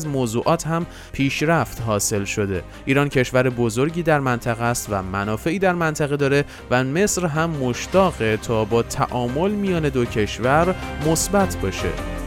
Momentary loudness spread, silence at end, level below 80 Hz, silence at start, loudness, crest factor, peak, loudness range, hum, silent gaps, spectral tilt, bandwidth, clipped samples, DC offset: 6 LU; 0 s; -38 dBFS; 0 s; -21 LUFS; 18 dB; -4 dBFS; 1 LU; none; none; -5 dB/octave; 17 kHz; under 0.1%; under 0.1%